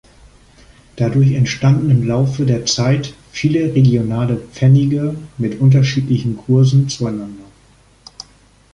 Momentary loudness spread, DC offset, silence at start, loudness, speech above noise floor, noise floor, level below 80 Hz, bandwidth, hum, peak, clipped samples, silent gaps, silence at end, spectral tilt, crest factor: 11 LU; under 0.1%; 0.95 s; -15 LUFS; 35 dB; -49 dBFS; -44 dBFS; 9.6 kHz; none; -2 dBFS; under 0.1%; none; 1.3 s; -6.5 dB/octave; 14 dB